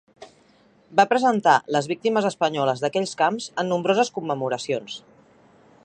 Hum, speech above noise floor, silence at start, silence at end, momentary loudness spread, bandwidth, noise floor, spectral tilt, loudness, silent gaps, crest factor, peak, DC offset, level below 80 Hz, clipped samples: none; 35 dB; 0.2 s; 0.85 s; 8 LU; 10 kHz; -57 dBFS; -4.5 dB/octave; -22 LUFS; none; 20 dB; -2 dBFS; under 0.1%; -72 dBFS; under 0.1%